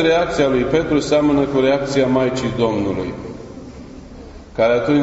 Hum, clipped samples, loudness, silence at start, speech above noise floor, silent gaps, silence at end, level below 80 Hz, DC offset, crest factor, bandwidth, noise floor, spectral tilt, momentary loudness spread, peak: none; under 0.1%; -17 LUFS; 0 s; 20 dB; none; 0 s; -40 dBFS; under 0.1%; 14 dB; 8 kHz; -36 dBFS; -6 dB/octave; 21 LU; -4 dBFS